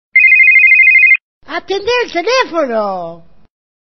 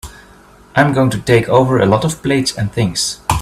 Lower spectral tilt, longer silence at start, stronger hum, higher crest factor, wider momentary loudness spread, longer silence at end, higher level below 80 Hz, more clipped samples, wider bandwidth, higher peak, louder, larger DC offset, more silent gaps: second, 0.5 dB/octave vs -5 dB/octave; about the same, 0.15 s vs 0.05 s; neither; about the same, 10 dB vs 14 dB; first, 20 LU vs 6 LU; first, 0.8 s vs 0 s; second, -54 dBFS vs -36 dBFS; neither; second, 6.4 kHz vs 14.5 kHz; about the same, 0 dBFS vs 0 dBFS; first, -7 LUFS vs -14 LUFS; neither; first, 1.22-1.41 s vs none